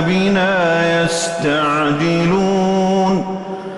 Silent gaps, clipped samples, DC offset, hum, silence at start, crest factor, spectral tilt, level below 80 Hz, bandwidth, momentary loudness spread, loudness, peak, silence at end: none; under 0.1%; under 0.1%; none; 0 s; 10 dB; -5.5 dB/octave; -48 dBFS; 11.5 kHz; 3 LU; -16 LUFS; -6 dBFS; 0 s